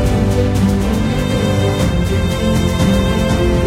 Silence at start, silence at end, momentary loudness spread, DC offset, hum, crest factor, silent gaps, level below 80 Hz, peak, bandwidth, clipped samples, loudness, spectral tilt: 0 s; 0 s; 2 LU; under 0.1%; none; 12 dB; none; -22 dBFS; -2 dBFS; 16 kHz; under 0.1%; -15 LUFS; -6.5 dB/octave